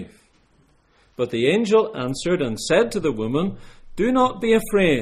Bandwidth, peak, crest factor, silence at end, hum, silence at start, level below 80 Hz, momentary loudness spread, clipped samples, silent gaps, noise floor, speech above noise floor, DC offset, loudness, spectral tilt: 15 kHz; -4 dBFS; 18 dB; 0 s; none; 0 s; -44 dBFS; 9 LU; under 0.1%; none; -59 dBFS; 39 dB; under 0.1%; -21 LUFS; -5.5 dB/octave